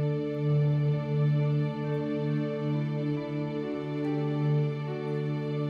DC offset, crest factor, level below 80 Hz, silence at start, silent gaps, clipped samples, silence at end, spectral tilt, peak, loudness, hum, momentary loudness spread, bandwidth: under 0.1%; 10 dB; -64 dBFS; 0 s; none; under 0.1%; 0 s; -10 dB/octave; -18 dBFS; -29 LUFS; none; 6 LU; 5 kHz